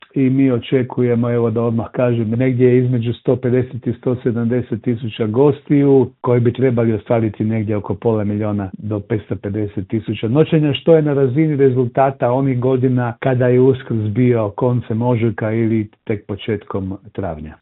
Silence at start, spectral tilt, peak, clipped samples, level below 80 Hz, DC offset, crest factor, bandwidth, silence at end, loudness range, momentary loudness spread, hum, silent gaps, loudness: 0.15 s; -12.5 dB/octave; 0 dBFS; under 0.1%; -52 dBFS; under 0.1%; 16 dB; 4.1 kHz; 0.05 s; 4 LU; 10 LU; none; none; -17 LUFS